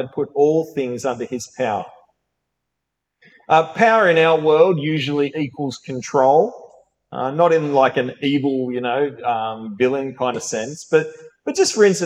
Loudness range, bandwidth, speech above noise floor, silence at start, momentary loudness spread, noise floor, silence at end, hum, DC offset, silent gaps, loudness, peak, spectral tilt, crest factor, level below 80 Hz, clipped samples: 5 LU; 12.5 kHz; 61 dB; 0 s; 12 LU; -79 dBFS; 0 s; none; under 0.1%; none; -19 LUFS; -2 dBFS; -5 dB/octave; 16 dB; -68 dBFS; under 0.1%